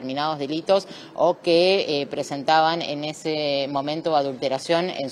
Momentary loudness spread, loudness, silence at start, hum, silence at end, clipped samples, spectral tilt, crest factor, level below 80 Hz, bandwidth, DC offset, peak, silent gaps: 8 LU; -23 LUFS; 0 s; none; 0 s; under 0.1%; -4.5 dB/octave; 18 dB; -72 dBFS; 12.5 kHz; under 0.1%; -4 dBFS; none